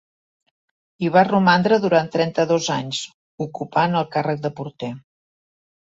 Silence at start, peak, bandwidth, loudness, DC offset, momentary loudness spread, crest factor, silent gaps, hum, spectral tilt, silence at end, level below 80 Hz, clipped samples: 1 s; -2 dBFS; 8 kHz; -20 LUFS; under 0.1%; 16 LU; 18 dB; 3.14-3.38 s; none; -5.5 dB/octave; 0.95 s; -62 dBFS; under 0.1%